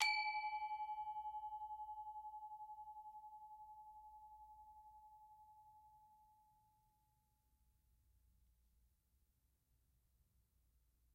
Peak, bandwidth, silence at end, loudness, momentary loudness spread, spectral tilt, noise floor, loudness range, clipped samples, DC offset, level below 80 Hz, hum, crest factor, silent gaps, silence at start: -20 dBFS; 15.5 kHz; 4.7 s; -48 LUFS; 21 LU; 2 dB/octave; -81 dBFS; 18 LU; under 0.1%; under 0.1%; -80 dBFS; none; 32 dB; none; 0 s